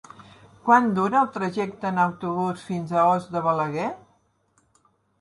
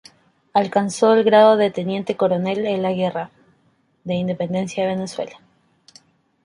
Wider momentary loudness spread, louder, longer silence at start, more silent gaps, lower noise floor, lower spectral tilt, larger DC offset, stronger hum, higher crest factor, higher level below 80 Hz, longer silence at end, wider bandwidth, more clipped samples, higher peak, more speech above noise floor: second, 11 LU vs 16 LU; second, -23 LUFS vs -19 LUFS; second, 0.2 s vs 0.55 s; neither; first, -66 dBFS vs -62 dBFS; about the same, -7 dB/octave vs -6 dB/octave; neither; neither; about the same, 20 dB vs 18 dB; about the same, -66 dBFS vs -64 dBFS; about the same, 1.25 s vs 1.15 s; about the same, 11.5 kHz vs 11.5 kHz; neither; about the same, -4 dBFS vs -2 dBFS; about the same, 43 dB vs 44 dB